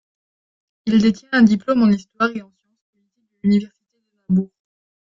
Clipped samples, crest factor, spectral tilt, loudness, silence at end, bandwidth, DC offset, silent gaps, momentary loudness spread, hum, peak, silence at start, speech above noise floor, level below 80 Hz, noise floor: under 0.1%; 18 dB; -7 dB/octave; -18 LUFS; 0.6 s; 7.4 kHz; under 0.1%; 2.82-2.93 s; 15 LU; none; -2 dBFS; 0.85 s; 55 dB; -58 dBFS; -72 dBFS